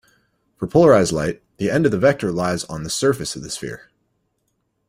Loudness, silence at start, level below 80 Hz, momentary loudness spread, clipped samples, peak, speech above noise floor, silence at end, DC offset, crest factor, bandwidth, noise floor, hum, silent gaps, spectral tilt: -19 LUFS; 0.6 s; -50 dBFS; 15 LU; under 0.1%; -2 dBFS; 52 dB; 1.15 s; under 0.1%; 18 dB; 16 kHz; -71 dBFS; none; none; -5 dB/octave